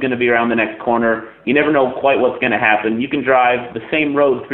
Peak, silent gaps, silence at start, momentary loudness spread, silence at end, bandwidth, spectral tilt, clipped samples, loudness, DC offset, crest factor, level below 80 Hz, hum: 0 dBFS; none; 0 s; 5 LU; 0 s; 4.2 kHz; -9.5 dB/octave; under 0.1%; -16 LUFS; under 0.1%; 16 dB; -56 dBFS; none